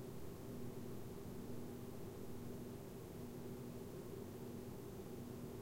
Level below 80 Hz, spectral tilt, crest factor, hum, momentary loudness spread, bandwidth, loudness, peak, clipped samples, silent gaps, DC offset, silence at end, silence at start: -64 dBFS; -6.5 dB/octave; 12 dB; none; 1 LU; 16 kHz; -52 LUFS; -36 dBFS; under 0.1%; none; under 0.1%; 0 s; 0 s